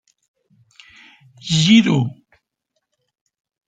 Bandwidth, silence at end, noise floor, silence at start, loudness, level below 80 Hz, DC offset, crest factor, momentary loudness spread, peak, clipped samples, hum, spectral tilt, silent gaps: 9.2 kHz; 1.6 s; -75 dBFS; 1.45 s; -15 LUFS; -60 dBFS; under 0.1%; 20 dB; 15 LU; -2 dBFS; under 0.1%; none; -5 dB/octave; none